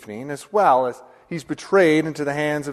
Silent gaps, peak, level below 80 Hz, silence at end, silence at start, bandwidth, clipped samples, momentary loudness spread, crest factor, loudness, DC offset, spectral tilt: none; -4 dBFS; -62 dBFS; 0 s; 0 s; 13.5 kHz; under 0.1%; 15 LU; 16 dB; -20 LUFS; under 0.1%; -5.5 dB/octave